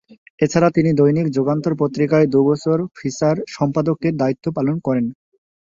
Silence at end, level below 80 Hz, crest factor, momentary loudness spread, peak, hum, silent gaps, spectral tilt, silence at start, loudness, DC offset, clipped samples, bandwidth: 0.65 s; -56 dBFS; 16 dB; 6 LU; -2 dBFS; none; 0.18-0.38 s; -7.5 dB/octave; 0.1 s; -18 LUFS; under 0.1%; under 0.1%; 7.6 kHz